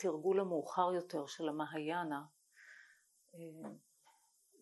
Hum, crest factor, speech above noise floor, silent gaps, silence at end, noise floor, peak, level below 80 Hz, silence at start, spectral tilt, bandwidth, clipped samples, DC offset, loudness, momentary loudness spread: none; 22 dB; 33 dB; none; 0.85 s; -72 dBFS; -18 dBFS; under -90 dBFS; 0 s; -5.5 dB/octave; 12 kHz; under 0.1%; under 0.1%; -39 LUFS; 24 LU